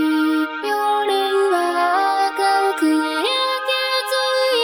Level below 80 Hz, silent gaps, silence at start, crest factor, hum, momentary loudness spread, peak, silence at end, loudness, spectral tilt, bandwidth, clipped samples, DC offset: -74 dBFS; none; 0 s; 12 dB; none; 2 LU; -6 dBFS; 0 s; -18 LUFS; -0.5 dB/octave; 18 kHz; under 0.1%; under 0.1%